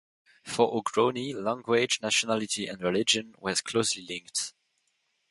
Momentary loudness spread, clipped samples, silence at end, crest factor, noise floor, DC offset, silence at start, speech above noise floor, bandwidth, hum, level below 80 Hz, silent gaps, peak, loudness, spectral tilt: 7 LU; under 0.1%; 0.8 s; 22 dB; -75 dBFS; under 0.1%; 0.45 s; 47 dB; 11.5 kHz; none; -68 dBFS; none; -8 dBFS; -28 LUFS; -2.5 dB/octave